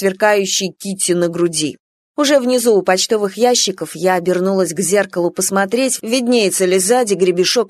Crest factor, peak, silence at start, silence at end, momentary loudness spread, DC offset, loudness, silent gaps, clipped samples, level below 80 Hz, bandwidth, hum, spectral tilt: 14 dB; 0 dBFS; 0 s; 0 s; 5 LU; under 0.1%; -15 LUFS; 1.80-2.14 s; under 0.1%; -64 dBFS; 13.5 kHz; none; -3 dB/octave